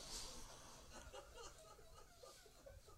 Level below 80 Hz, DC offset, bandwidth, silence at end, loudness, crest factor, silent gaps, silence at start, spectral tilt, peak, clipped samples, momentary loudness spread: -64 dBFS; under 0.1%; 16 kHz; 0 s; -58 LUFS; 20 dB; none; 0 s; -2 dB/octave; -38 dBFS; under 0.1%; 11 LU